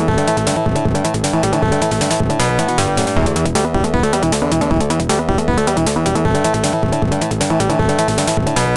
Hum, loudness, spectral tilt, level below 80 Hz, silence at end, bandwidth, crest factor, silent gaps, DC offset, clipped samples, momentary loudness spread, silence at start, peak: none; -16 LUFS; -5 dB/octave; -30 dBFS; 0 s; 12.5 kHz; 14 dB; none; under 0.1%; under 0.1%; 2 LU; 0 s; -2 dBFS